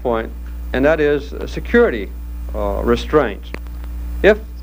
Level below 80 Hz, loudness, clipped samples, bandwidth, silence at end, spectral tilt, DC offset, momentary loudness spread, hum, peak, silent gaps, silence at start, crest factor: -26 dBFS; -18 LUFS; under 0.1%; 16 kHz; 0 s; -7 dB/octave; under 0.1%; 15 LU; none; 0 dBFS; none; 0 s; 18 dB